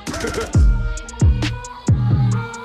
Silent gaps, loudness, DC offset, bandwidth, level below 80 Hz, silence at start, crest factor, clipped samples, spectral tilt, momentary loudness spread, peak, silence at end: none; -19 LUFS; under 0.1%; 12.5 kHz; -22 dBFS; 0 s; 10 dB; under 0.1%; -6 dB/octave; 8 LU; -8 dBFS; 0 s